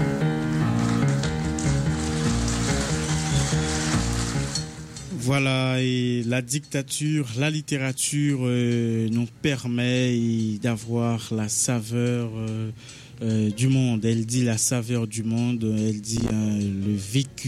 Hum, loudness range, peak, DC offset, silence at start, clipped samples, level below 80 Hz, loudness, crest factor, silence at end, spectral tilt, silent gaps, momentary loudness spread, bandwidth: none; 1 LU; -10 dBFS; under 0.1%; 0 s; under 0.1%; -40 dBFS; -24 LUFS; 14 dB; 0 s; -5 dB/octave; none; 5 LU; 14.5 kHz